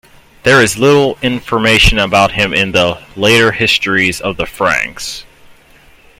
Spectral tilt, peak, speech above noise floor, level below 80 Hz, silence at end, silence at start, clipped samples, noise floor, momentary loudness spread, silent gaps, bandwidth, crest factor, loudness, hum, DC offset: -4 dB/octave; 0 dBFS; 32 dB; -28 dBFS; 0.95 s; 0.45 s; under 0.1%; -44 dBFS; 10 LU; none; 16.5 kHz; 12 dB; -11 LUFS; none; under 0.1%